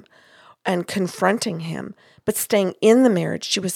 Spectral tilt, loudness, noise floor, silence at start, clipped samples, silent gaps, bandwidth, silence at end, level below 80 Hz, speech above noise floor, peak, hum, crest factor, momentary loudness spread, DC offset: -4.5 dB/octave; -21 LUFS; -51 dBFS; 0.65 s; under 0.1%; none; 18.5 kHz; 0 s; -64 dBFS; 31 dB; -2 dBFS; none; 18 dB; 14 LU; under 0.1%